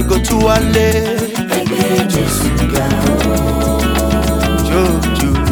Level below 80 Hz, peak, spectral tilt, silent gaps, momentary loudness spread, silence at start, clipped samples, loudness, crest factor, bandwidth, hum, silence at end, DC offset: -20 dBFS; 0 dBFS; -5 dB/octave; none; 3 LU; 0 s; under 0.1%; -14 LUFS; 12 dB; over 20 kHz; none; 0 s; under 0.1%